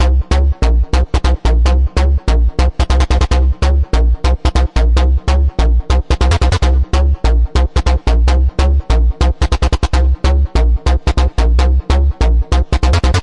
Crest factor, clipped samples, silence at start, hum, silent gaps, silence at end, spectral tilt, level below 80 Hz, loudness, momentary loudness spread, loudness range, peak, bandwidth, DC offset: 10 dB; under 0.1%; 0 s; none; none; 0 s; -6 dB/octave; -12 dBFS; -14 LUFS; 2 LU; 0 LU; 0 dBFS; 10 kHz; under 0.1%